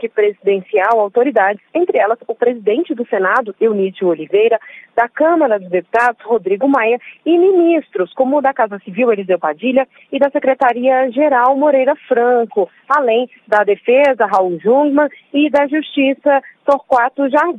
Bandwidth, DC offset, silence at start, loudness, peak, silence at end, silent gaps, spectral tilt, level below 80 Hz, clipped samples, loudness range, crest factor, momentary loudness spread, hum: 8.6 kHz; under 0.1%; 0 s; -14 LUFS; 0 dBFS; 0 s; none; -6.5 dB/octave; -68 dBFS; under 0.1%; 2 LU; 14 dB; 6 LU; none